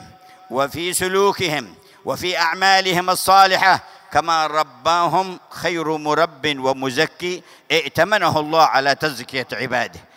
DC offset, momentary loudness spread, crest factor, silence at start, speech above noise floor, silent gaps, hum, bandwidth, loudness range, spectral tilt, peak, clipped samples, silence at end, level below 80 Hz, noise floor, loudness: under 0.1%; 11 LU; 18 dB; 0 s; 26 dB; none; none; 16 kHz; 4 LU; -3 dB/octave; 0 dBFS; under 0.1%; 0.2 s; -56 dBFS; -44 dBFS; -18 LUFS